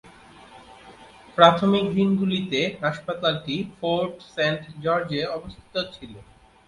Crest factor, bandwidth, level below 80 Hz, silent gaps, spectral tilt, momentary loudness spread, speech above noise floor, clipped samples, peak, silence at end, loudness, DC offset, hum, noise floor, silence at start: 24 dB; 11 kHz; -56 dBFS; none; -6 dB/octave; 15 LU; 25 dB; under 0.1%; 0 dBFS; 0.45 s; -23 LUFS; under 0.1%; none; -48 dBFS; 0.5 s